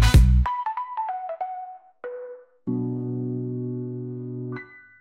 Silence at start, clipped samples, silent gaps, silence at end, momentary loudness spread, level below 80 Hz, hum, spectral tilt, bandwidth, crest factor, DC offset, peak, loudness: 0 s; under 0.1%; none; 0.2 s; 17 LU; -26 dBFS; none; -6.5 dB/octave; 15 kHz; 18 dB; under 0.1%; -6 dBFS; -27 LUFS